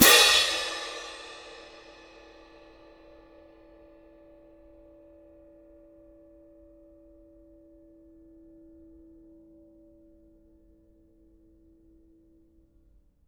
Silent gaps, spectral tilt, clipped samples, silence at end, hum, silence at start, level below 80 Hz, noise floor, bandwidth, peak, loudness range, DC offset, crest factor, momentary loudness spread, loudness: none; -0.5 dB/octave; under 0.1%; 11.95 s; none; 0 s; -60 dBFS; -62 dBFS; 19 kHz; -2 dBFS; 20 LU; under 0.1%; 30 dB; 34 LU; -21 LUFS